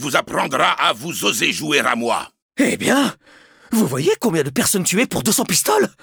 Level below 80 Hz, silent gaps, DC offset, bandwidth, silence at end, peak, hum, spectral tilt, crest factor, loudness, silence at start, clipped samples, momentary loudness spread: -56 dBFS; 2.42-2.49 s; under 0.1%; over 20 kHz; 0.15 s; -2 dBFS; none; -3 dB/octave; 18 dB; -18 LUFS; 0 s; under 0.1%; 5 LU